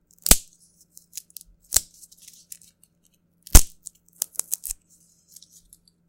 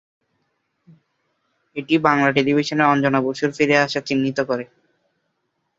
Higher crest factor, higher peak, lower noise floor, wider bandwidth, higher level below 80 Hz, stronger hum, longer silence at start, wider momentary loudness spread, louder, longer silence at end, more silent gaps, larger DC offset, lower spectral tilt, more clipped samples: about the same, 24 dB vs 22 dB; about the same, 0 dBFS vs 0 dBFS; second, -65 dBFS vs -73 dBFS; first, 17 kHz vs 7.8 kHz; first, -28 dBFS vs -64 dBFS; neither; second, 0.3 s vs 1.75 s; first, 27 LU vs 10 LU; about the same, -21 LUFS vs -19 LUFS; first, 1.35 s vs 1.15 s; neither; neither; second, -2 dB/octave vs -5.5 dB/octave; neither